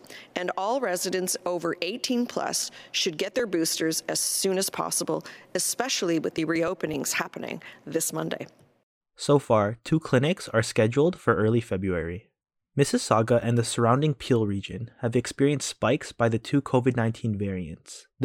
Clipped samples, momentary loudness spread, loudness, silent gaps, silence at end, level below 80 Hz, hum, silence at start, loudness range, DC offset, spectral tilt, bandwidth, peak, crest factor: under 0.1%; 10 LU; -26 LUFS; 8.83-9.01 s; 0 s; -58 dBFS; none; 0.1 s; 3 LU; under 0.1%; -4.5 dB/octave; 16.5 kHz; -6 dBFS; 20 dB